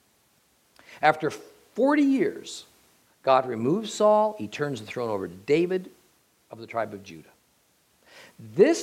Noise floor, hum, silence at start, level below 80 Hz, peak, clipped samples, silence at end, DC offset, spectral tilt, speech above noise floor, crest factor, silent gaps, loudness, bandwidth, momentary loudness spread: -65 dBFS; none; 0.9 s; -76 dBFS; -6 dBFS; under 0.1%; 0 s; under 0.1%; -5.5 dB/octave; 41 dB; 22 dB; none; -25 LUFS; 15.5 kHz; 18 LU